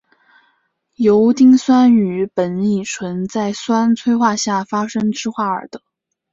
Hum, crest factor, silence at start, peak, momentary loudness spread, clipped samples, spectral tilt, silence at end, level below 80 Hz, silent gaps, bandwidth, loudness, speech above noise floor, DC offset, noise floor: none; 14 dB; 1 s; -2 dBFS; 11 LU; under 0.1%; -5.5 dB/octave; 0.55 s; -58 dBFS; none; 7.8 kHz; -16 LUFS; 50 dB; under 0.1%; -64 dBFS